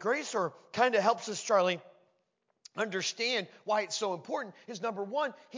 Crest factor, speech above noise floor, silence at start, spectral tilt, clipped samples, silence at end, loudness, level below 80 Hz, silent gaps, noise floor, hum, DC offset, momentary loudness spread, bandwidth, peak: 22 dB; 46 dB; 0 s; -3 dB/octave; under 0.1%; 0 s; -32 LUFS; -86 dBFS; none; -78 dBFS; none; under 0.1%; 10 LU; 7.6 kHz; -12 dBFS